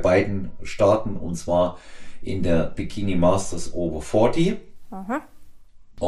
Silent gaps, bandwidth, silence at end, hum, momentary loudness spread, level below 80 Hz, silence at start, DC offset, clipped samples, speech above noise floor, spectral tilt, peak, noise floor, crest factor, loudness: none; 12 kHz; 0 s; none; 15 LU; -40 dBFS; 0 s; under 0.1%; under 0.1%; 21 dB; -6.5 dB/octave; -4 dBFS; -43 dBFS; 18 dB; -23 LUFS